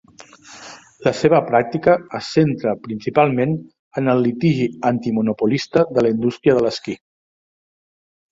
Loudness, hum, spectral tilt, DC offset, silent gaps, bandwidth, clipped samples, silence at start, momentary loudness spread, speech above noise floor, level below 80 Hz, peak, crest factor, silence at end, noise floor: -18 LUFS; none; -7 dB/octave; under 0.1%; 3.79-3.91 s; 7.8 kHz; under 0.1%; 0.2 s; 13 LU; 27 dB; -56 dBFS; 0 dBFS; 18 dB; 1.35 s; -44 dBFS